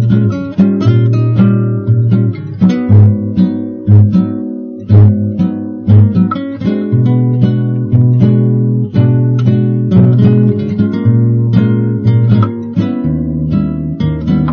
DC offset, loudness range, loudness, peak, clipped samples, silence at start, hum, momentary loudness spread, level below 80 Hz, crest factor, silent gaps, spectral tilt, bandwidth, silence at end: under 0.1%; 2 LU; -11 LUFS; 0 dBFS; 0.7%; 0 s; none; 8 LU; -36 dBFS; 10 dB; none; -11 dB/octave; 4.7 kHz; 0 s